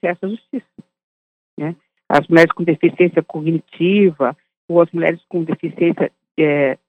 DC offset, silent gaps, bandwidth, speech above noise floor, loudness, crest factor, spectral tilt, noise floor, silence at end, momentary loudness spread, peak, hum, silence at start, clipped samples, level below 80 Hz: under 0.1%; 1.04-1.57 s, 4.57-4.68 s; 8.4 kHz; over 74 dB; -17 LUFS; 16 dB; -8 dB/octave; under -90 dBFS; 0.15 s; 14 LU; 0 dBFS; none; 0.05 s; under 0.1%; -64 dBFS